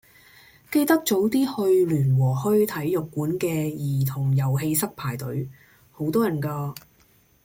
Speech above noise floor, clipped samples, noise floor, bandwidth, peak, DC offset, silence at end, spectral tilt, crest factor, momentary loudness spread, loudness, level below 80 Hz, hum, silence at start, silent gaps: 37 dB; under 0.1%; -59 dBFS; 17 kHz; -6 dBFS; under 0.1%; 0.65 s; -6.5 dB/octave; 18 dB; 11 LU; -24 LUFS; -58 dBFS; none; 0.7 s; none